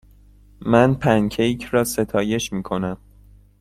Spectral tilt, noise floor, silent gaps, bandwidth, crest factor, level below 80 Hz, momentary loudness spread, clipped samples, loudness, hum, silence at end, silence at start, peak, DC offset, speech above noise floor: -5.5 dB/octave; -49 dBFS; none; 16 kHz; 20 dB; -46 dBFS; 11 LU; under 0.1%; -20 LUFS; 50 Hz at -45 dBFS; 0.65 s; 0.6 s; -2 dBFS; under 0.1%; 30 dB